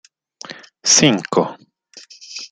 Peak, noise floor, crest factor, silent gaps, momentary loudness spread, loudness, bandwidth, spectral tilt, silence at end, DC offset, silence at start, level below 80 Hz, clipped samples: 0 dBFS; -44 dBFS; 20 dB; none; 23 LU; -15 LUFS; 11 kHz; -2.5 dB/octave; 0.05 s; under 0.1%; 0.5 s; -58 dBFS; under 0.1%